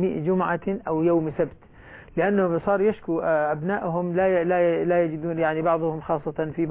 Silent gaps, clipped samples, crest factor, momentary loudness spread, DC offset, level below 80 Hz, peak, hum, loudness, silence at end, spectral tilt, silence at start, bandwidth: none; under 0.1%; 14 dB; 6 LU; under 0.1%; -54 dBFS; -10 dBFS; none; -24 LUFS; 0 s; -11.5 dB/octave; 0 s; 3.9 kHz